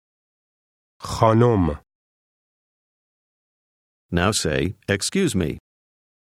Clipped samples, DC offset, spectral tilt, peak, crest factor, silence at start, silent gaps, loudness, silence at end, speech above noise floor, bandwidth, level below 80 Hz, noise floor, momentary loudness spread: under 0.1%; under 0.1%; -5 dB/octave; 0 dBFS; 24 dB; 1 s; 1.95-4.09 s; -21 LUFS; 0.8 s; over 70 dB; 15 kHz; -44 dBFS; under -90 dBFS; 16 LU